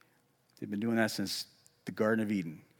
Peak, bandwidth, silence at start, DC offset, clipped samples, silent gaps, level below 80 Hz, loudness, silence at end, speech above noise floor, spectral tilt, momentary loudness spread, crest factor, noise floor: -16 dBFS; 17.5 kHz; 0.6 s; under 0.1%; under 0.1%; none; -84 dBFS; -33 LUFS; 0.2 s; 37 dB; -5 dB/octave; 16 LU; 18 dB; -71 dBFS